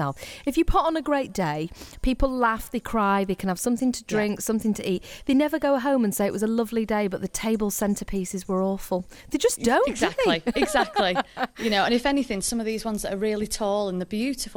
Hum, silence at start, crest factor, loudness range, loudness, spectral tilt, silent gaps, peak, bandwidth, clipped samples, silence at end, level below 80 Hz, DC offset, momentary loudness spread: none; 0 s; 16 dB; 2 LU; -25 LUFS; -4.5 dB/octave; none; -8 dBFS; 19.5 kHz; under 0.1%; 0 s; -40 dBFS; under 0.1%; 7 LU